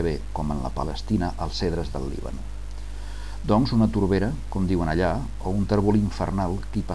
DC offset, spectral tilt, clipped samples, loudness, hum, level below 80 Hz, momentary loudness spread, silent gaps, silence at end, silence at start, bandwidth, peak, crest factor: 2%; -7.5 dB/octave; under 0.1%; -25 LUFS; 50 Hz at -35 dBFS; -34 dBFS; 16 LU; none; 0 s; 0 s; 11 kHz; -8 dBFS; 16 dB